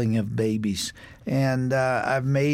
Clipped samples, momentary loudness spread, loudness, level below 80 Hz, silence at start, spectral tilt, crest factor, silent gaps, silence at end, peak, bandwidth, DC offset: under 0.1%; 7 LU; -25 LUFS; -54 dBFS; 0 s; -6 dB/octave; 12 dB; none; 0 s; -10 dBFS; 15.5 kHz; under 0.1%